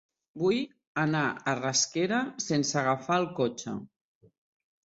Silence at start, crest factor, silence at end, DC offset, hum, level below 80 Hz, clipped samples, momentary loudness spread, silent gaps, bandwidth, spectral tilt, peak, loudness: 0.35 s; 18 dB; 1 s; under 0.1%; none; -70 dBFS; under 0.1%; 7 LU; 0.87-0.95 s; 8 kHz; -4 dB/octave; -14 dBFS; -29 LUFS